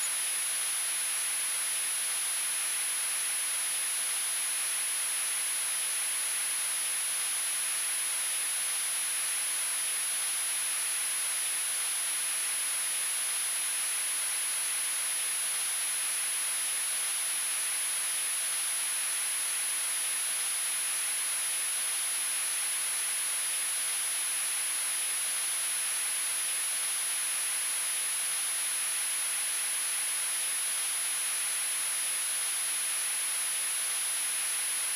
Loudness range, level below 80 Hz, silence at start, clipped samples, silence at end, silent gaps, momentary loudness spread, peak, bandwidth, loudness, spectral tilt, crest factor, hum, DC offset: 0 LU; -88 dBFS; 0 s; under 0.1%; 0 s; none; 0 LU; -20 dBFS; 11.5 kHz; -27 LUFS; 4 dB/octave; 10 dB; none; under 0.1%